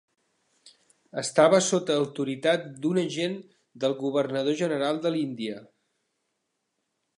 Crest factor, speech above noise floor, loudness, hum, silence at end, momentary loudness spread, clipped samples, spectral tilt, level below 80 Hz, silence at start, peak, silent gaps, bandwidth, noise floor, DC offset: 22 dB; 53 dB; -26 LUFS; none; 1.55 s; 13 LU; under 0.1%; -4.5 dB/octave; -80 dBFS; 1.15 s; -6 dBFS; none; 11.5 kHz; -79 dBFS; under 0.1%